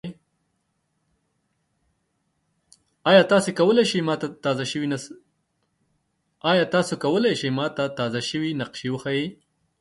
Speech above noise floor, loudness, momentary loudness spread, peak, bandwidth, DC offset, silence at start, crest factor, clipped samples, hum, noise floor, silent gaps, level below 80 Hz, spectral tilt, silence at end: 51 dB; -22 LUFS; 12 LU; -2 dBFS; 11.5 kHz; under 0.1%; 0.05 s; 22 dB; under 0.1%; none; -73 dBFS; none; -66 dBFS; -5 dB/octave; 0.45 s